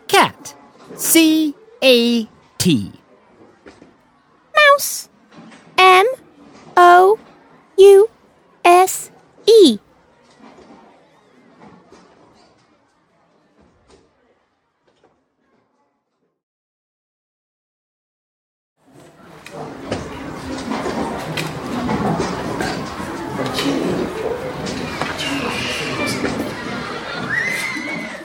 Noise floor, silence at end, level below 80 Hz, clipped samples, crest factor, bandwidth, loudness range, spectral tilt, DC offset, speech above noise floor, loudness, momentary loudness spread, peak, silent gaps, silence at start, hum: -69 dBFS; 0 s; -50 dBFS; under 0.1%; 18 dB; over 20 kHz; 14 LU; -3.5 dB/octave; under 0.1%; 54 dB; -16 LUFS; 17 LU; 0 dBFS; 16.43-18.76 s; 0.1 s; none